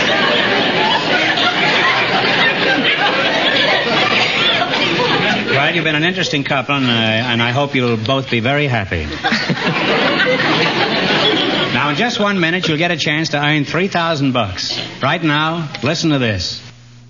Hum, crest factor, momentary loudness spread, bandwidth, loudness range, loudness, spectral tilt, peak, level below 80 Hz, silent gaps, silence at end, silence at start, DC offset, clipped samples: none; 14 dB; 5 LU; 7.4 kHz; 3 LU; -14 LUFS; -4.5 dB/octave; 0 dBFS; -46 dBFS; none; 0.1 s; 0 s; 0.2%; under 0.1%